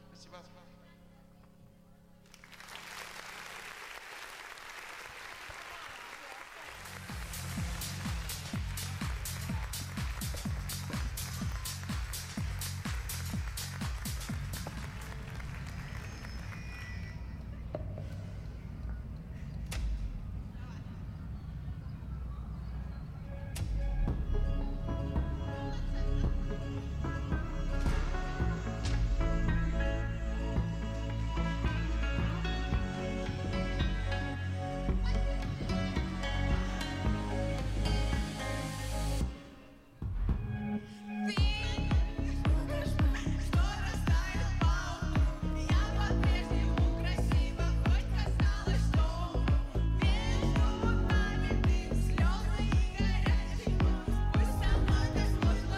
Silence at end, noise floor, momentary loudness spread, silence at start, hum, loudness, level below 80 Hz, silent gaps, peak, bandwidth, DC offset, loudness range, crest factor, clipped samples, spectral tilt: 0 s; -58 dBFS; 13 LU; 0.05 s; none; -35 LUFS; -36 dBFS; none; -18 dBFS; 15.5 kHz; under 0.1%; 12 LU; 14 dB; under 0.1%; -5.5 dB/octave